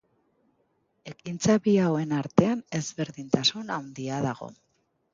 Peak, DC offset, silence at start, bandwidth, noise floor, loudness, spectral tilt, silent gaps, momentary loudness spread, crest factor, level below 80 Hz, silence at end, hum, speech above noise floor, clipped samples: -4 dBFS; under 0.1%; 1.05 s; 7.6 kHz; -71 dBFS; -26 LUFS; -5 dB/octave; none; 16 LU; 24 dB; -62 dBFS; 0.6 s; none; 45 dB; under 0.1%